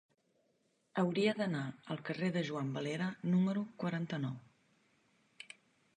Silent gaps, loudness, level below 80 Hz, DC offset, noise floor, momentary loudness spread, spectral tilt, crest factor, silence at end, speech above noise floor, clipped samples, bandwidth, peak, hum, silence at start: none; -37 LUFS; -80 dBFS; under 0.1%; -77 dBFS; 20 LU; -7 dB/octave; 18 dB; 1.55 s; 41 dB; under 0.1%; 9.4 kHz; -20 dBFS; none; 0.95 s